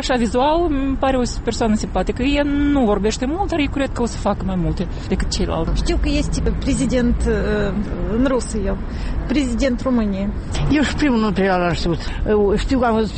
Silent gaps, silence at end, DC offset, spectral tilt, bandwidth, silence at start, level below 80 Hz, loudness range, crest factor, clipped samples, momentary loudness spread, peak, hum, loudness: none; 0 s; under 0.1%; -6 dB/octave; 8.8 kHz; 0 s; -24 dBFS; 2 LU; 12 dB; under 0.1%; 6 LU; -6 dBFS; none; -19 LUFS